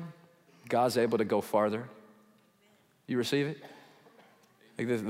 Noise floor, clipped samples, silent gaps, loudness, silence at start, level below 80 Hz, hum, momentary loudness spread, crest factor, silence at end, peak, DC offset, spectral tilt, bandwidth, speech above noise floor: -66 dBFS; under 0.1%; none; -31 LUFS; 0 s; -82 dBFS; none; 20 LU; 20 dB; 0 s; -14 dBFS; under 0.1%; -5.5 dB/octave; 16 kHz; 37 dB